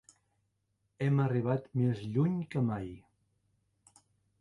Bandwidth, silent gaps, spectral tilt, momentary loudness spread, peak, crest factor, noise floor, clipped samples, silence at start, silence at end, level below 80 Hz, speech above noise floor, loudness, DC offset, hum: 10.5 kHz; none; -9 dB/octave; 6 LU; -18 dBFS; 16 dB; -79 dBFS; under 0.1%; 1 s; 1.4 s; -64 dBFS; 48 dB; -32 LUFS; under 0.1%; none